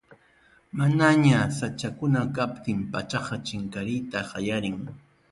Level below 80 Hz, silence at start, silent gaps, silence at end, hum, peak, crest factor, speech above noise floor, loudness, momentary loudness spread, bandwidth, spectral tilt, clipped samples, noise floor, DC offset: -56 dBFS; 0.1 s; none; 0.3 s; none; -6 dBFS; 20 dB; 35 dB; -26 LUFS; 13 LU; 11.5 kHz; -6 dB/octave; under 0.1%; -60 dBFS; under 0.1%